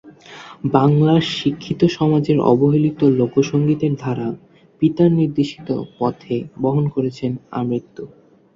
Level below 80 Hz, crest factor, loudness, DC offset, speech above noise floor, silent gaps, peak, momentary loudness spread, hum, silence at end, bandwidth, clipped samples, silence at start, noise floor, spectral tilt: -54 dBFS; 16 dB; -18 LUFS; under 0.1%; 22 dB; none; -2 dBFS; 11 LU; none; 0.5 s; 7.6 kHz; under 0.1%; 0.05 s; -39 dBFS; -8 dB/octave